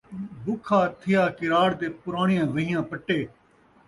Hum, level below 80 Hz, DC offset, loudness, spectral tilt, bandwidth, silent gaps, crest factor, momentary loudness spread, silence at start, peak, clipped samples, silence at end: none; -60 dBFS; under 0.1%; -25 LUFS; -7 dB/octave; 11.5 kHz; none; 16 dB; 10 LU; 0.1 s; -10 dBFS; under 0.1%; 0.6 s